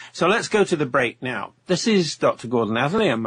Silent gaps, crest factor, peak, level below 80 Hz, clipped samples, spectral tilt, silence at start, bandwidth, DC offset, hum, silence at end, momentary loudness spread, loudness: none; 14 dB; -6 dBFS; -58 dBFS; under 0.1%; -4.5 dB/octave; 0 s; 10.5 kHz; under 0.1%; none; 0 s; 7 LU; -21 LUFS